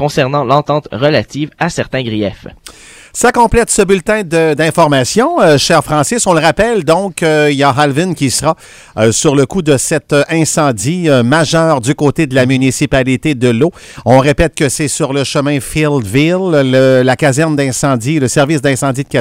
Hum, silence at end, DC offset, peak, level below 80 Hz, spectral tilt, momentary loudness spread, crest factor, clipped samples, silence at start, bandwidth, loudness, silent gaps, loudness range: none; 0 s; 0.1%; 0 dBFS; -34 dBFS; -5 dB/octave; 6 LU; 12 dB; 0.3%; 0 s; 16.5 kHz; -11 LUFS; none; 3 LU